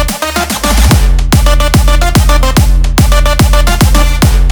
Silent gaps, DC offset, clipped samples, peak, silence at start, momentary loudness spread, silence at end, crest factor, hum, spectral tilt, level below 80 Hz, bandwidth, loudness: none; under 0.1%; 0.3%; 0 dBFS; 0 s; 3 LU; 0 s; 6 dB; none; -4.5 dB/octave; -8 dBFS; over 20 kHz; -9 LUFS